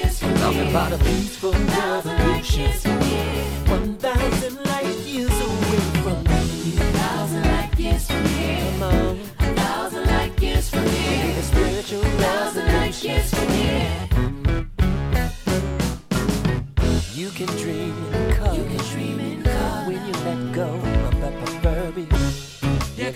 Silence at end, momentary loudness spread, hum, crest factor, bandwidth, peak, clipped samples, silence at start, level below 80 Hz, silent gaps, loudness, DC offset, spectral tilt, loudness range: 0 s; 5 LU; none; 16 dB; 16.5 kHz; -4 dBFS; under 0.1%; 0 s; -26 dBFS; none; -22 LUFS; under 0.1%; -5.5 dB/octave; 3 LU